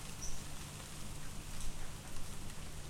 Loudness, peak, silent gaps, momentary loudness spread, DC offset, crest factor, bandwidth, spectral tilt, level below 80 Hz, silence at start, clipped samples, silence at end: -48 LUFS; -26 dBFS; none; 3 LU; under 0.1%; 14 dB; 16 kHz; -3 dB/octave; -48 dBFS; 0 s; under 0.1%; 0 s